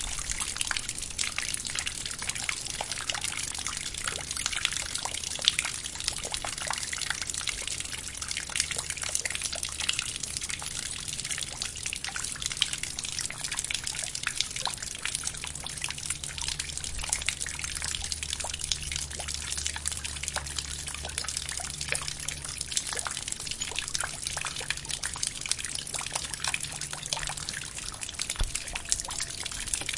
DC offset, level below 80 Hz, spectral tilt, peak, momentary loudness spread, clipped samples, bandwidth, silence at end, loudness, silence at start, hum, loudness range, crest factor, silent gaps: under 0.1%; -46 dBFS; 0 dB/octave; 0 dBFS; 4 LU; under 0.1%; 11.5 kHz; 0 s; -31 LUFS; 0 s; none; 2 LU; 32 dB; none